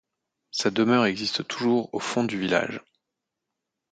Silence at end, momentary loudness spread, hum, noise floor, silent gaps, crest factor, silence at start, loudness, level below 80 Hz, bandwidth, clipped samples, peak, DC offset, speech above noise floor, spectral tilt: 1.1 s; 9 LU; none; -84 dBFS; none; 20 dB; 0.55 s; -25 LUFS; -66 dBFS; 9.2 kHz; under 0.1%; -8 dBFS; under 0.1%; 60 dB; -4.5 dB/octave